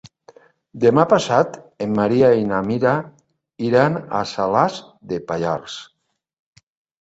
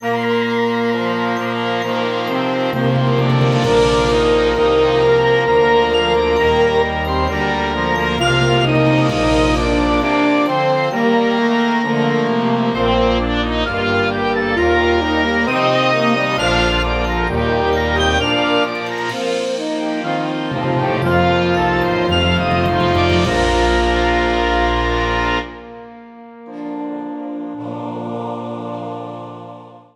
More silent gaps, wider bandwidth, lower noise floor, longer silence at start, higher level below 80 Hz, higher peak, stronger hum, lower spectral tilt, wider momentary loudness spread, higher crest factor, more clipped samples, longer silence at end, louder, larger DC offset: neither; second, 8 kHz vs 13.5 kHz; first, -50 dBFS vs -37 dBFS; first, 0.75 s vs 0 s; second, -56 dBFS vs -30 dBFS; about the same, -2 dBFS vs -2 dBFS; neither; about the same, -6.5 dB/octave vs -6 dB/octave; about the same, 13 LU vs 12 LU; about the same, 18 dB vs 14 dB; neither; first, 1.15 s vs 0.15 s; second, -19 LUFS vs -16 LUFS; neither